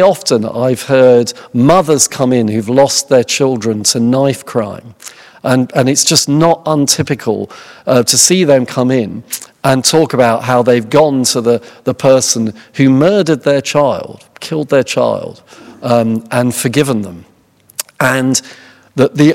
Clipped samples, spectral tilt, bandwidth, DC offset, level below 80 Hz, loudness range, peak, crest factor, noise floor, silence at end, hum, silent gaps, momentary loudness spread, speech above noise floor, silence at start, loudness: 0.5%; -4 dB/octave; over 20 kHz; under 0.1%; -52 dBFS; 4 LU; 0 dBFS; 12 dB; -48 dBFS; 0 s; none; none; 13 LU; 37 dB; 0 s; -11 LUFS